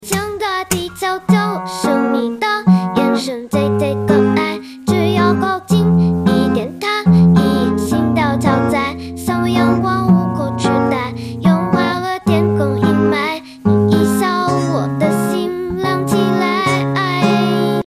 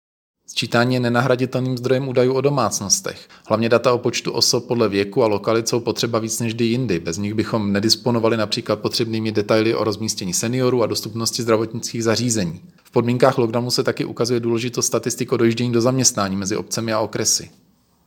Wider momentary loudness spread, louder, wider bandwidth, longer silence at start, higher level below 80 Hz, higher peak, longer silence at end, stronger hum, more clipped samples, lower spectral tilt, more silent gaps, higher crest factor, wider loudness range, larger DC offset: about the same, 7 LU vs 6 LU; first, -15 LUFS vs -19 LUFS; second, 16 kHz vs 19 kHz; second, 0 s vs 0.5 s; first, -42 dBFS vs -60 dBFS; about the same, 0 dBFS vs 0 dBFS; second, 0.05 s vs 0.6 s; neither; neither; first, -6.5 dB/octave vs -4 dB/octave; neither; second, 14 dB vs 20 dB; about the same, 2 LU vs 2 LU; neither